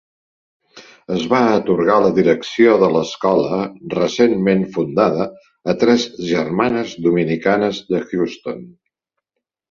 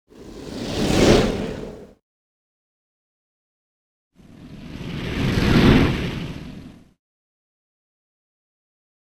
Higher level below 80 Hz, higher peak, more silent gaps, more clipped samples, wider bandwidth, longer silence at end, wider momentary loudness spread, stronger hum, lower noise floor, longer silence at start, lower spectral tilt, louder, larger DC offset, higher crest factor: second, -56 dBFS vs -34 dBFS; about the same, -2 dBFS vs 0 dBFS; second, none vs 2.02-4.11 s; neither; second, 7.4 kHz vs over 20 kHz; second, 1 s vs 2.35 s; second, 9 LU vs 23 LU; neither; first, -79 dBFS vs -42 dBFS; first, 0.75 s vs 0.15 s; about the same, -6 dB/octave vs -6 dB/octave; about the same, -17 LUFS vs -19 LUFS; neither; second, 16 dB vs 22 dB